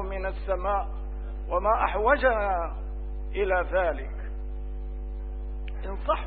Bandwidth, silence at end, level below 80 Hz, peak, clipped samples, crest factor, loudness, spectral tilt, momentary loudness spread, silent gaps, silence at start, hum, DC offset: 4.5 kHz; 0 s; -34 dBFS; -8 dBFS; under 0.1%; 20 dB; -29 LUFS; -10 dB/octave; 14 LU; none; 0 s; 50 Hz at -35 dBFS; 0.3%